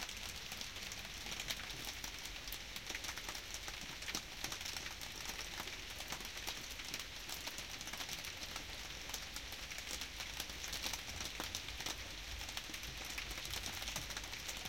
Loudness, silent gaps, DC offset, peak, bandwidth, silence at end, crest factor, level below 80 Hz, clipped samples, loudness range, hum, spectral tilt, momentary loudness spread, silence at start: -44 LUFS; none; under 0.1%; -22 dBFS; 17 kHz; 0 s; 24 dB; -56 dBFS; under 0.1%; 1 LU; none; -1 dB/octave; 3 LU; 0 s